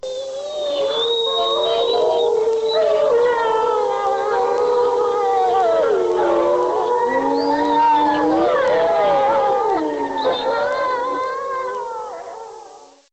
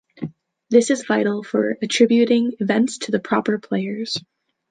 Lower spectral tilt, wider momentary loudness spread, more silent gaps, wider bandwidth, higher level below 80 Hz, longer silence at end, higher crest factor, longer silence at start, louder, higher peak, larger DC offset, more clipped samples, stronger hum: about the same, -4 dB/octave vs -4.5 dB/octave; about the same, 9 LU vs 11 LU; neither; second, 8.4 kHz vs 9.6 kHz; first, -54 dBFS vs -68 dBFS; second, 0.3 s vs 0.5 s; second, 10 dB vs 18 dB; second, 0.05 s vs 0.2 s; about the same, -18 LUFS vs -20 LUFS; second, -8 dBFS vs -2 dBFS; neither; neither; neither